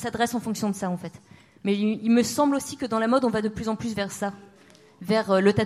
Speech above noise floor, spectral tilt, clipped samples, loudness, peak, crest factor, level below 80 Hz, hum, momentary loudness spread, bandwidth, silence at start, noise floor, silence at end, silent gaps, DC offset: 29 dB; -5.5 dB/octave; under 0.1%; -25 LUFS; -8 dBFS; 18 dB; -58 dBFS; none; 11 LU; 15.5 kHz; 0 s; -53 dBFS; 0 s; none; under 0.1%